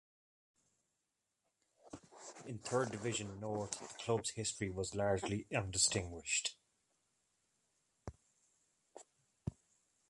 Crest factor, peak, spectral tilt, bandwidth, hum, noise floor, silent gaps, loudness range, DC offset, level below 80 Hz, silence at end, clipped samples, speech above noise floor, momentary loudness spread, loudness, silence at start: 24 dB; -20 dBFS; -3 dB/octave; 11.5 kHz; none; -87 dBFS; none; 9 LU; under 0.1%; -64 dBFS; 0.6 s; under 0.1%; 48 dB; 22 LU; -39 LUFS; 1.85 s